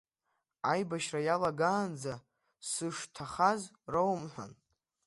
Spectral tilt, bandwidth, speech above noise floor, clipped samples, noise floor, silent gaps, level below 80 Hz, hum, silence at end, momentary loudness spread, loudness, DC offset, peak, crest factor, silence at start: -4.5 dB/octave; 11.5 kHz; 50 dB; under 0.1%; -83 dBFS; none; -70 dBFS; none; 0.55 s; 15 LU; -34 LUFS; under 0.1%; -14 dBFS; 22 dB; 0.65 s